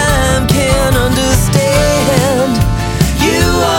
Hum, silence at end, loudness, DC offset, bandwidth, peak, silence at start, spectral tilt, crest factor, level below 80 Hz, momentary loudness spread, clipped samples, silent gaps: none; 0 s; -11 LUFS; under 0.1%; 17 kHz; 0 dBFS; 0 s; -4.5 dB/octave; 10 dB; -20 dBFS; 3 LU; under 0.1%; none